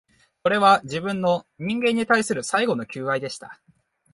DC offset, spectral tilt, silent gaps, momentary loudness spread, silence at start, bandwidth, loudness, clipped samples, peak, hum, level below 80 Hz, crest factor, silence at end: under 0.1%; -4.5 dB/octave; none; 10 LU; 0.45 s; 11.5 kHz; -22 LUFS; under 0.1%; -4 dBFS; none; -64 dBFS; 20 dB; 0.6 s